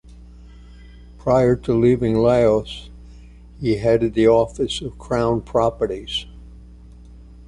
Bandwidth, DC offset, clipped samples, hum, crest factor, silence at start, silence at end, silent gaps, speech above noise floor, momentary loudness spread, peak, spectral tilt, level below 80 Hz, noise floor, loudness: 11 kHz; under 0.1%; under 0.1%; none; 16 dB; 0.15 s; 0.05 s; none; 24 dB; 12 LU; -4 dBFS; -7 dB/octave; -40 dBFS; -42 dBFS; -19 LUFS